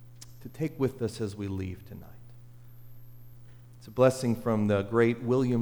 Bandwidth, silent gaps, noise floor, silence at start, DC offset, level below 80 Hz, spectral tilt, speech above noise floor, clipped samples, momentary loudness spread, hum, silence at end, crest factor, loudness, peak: over 20 kHz; none; -49 dBFS; 0 s; under 0.1%; -58 dBFS; -7 dB/octave; 21 dB; under 0.1%; 22 LU; 60 Hz at -55 dBFS; 0 s; 18 dB; -29 LUFS; -10 dBFS